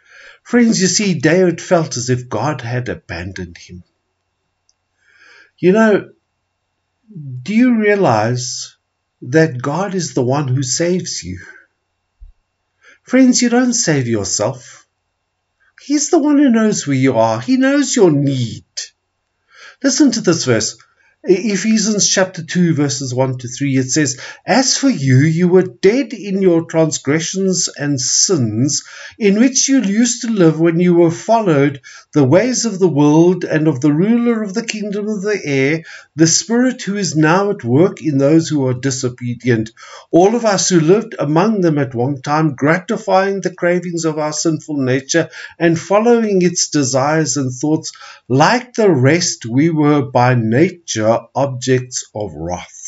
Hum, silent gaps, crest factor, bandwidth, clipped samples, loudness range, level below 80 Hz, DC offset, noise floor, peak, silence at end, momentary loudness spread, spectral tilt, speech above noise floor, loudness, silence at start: none; none; 14 dB; 8 kHz; under 0.1%; 5 LU; -56 dBFS; under 0.1%; -70 dBFS; 0 dBFS; 0 s; 10 LU; -4.5 dB/octave; 56 dB; -14 LUFS; 0.45 s